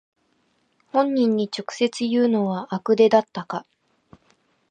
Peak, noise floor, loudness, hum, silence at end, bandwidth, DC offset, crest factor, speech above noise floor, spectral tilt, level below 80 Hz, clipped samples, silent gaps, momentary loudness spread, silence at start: -4 dBFS; -67 dBFS; -22 LUFS; none; 1.1 s; 9.4 kHz; under 0.1%; 20 dB; 46 dB; -6 dB/octave; -72 dBFS; under 0.1%; none; 13 LU; 0.95 s